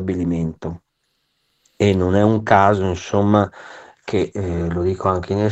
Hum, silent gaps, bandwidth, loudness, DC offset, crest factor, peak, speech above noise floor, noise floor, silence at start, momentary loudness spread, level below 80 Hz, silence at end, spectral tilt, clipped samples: none; none; 8.2 kHz; -19 LUFS; under 0.1%; 18 dB; 0 dBFS; 52 dB; -70 dBFS; 0 s; 17 LU; -44 dBFS; 0 s; -7.5 dB/octave; under 0.1%